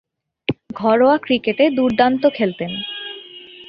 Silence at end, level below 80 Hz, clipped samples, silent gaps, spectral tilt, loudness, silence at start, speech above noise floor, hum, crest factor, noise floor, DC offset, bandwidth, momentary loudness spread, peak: 0.05 s; -56 dBFS; under 0.1%; none; -7.5 dB/octave; -18 LUFS; 0.5 s; 23 dB; none; 16 dB; -39 dBFS; under 0.1%; 5.4 kHz; 14 LU; -2 dBFS